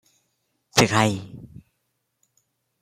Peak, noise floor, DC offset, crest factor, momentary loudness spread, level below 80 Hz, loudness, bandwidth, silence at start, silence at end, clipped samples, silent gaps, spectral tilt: -2 dBFS; -75 dBFS; under 0.1%; 26 dB; 24 LU; -56 dBFS; -21 LUFS; 16 kHz; 0.75 s; 1.35 s; under 0.1%; none; -4 dB/octave